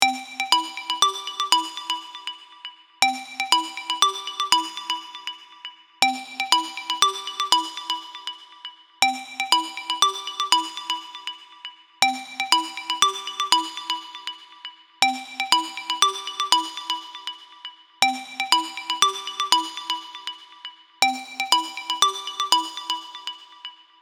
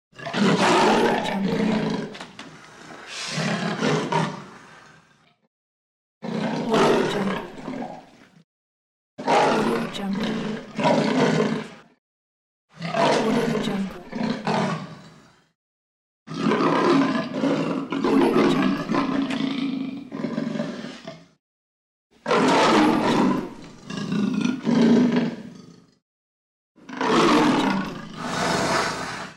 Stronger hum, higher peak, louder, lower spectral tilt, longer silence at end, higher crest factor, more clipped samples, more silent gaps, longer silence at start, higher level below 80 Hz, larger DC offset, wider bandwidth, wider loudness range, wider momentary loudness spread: neither; first, 0 dBFS vs -6 dBFS; about the same, -22 LUFS vs -22 LUFS; second, 2 dB/octave vs -5.5 dB/octave; first, 0.25 s vs 0.05 s; first, 26 dB vs 18 dB; neither; second, none vs 5.47-6.21 s, 8.44-9.17 s, 11.98-12.68 s, 15.55-16.26 s, 21.39-22.10 s, 26.02-26.75 s; second, 0 s vs 0.2 s; second, -84 dBFS vs -56 dBFS; neither; first, 19.5 kHz vs 13 kHz; second, 0 LU vs 6 LU; about the same, 18 LU vs 18 LU